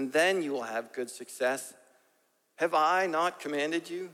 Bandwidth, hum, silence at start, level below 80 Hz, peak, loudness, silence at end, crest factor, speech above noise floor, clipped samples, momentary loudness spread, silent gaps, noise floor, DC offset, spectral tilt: 16.5 kHz; none; 0 s; -88 dBFS; -12 dBFS; -30 LUFS; 0 s; 18 dB; 42 dB; under 0.1%; 12 LU; none; -72 dBFS; under 0.1%; -3 dB/octave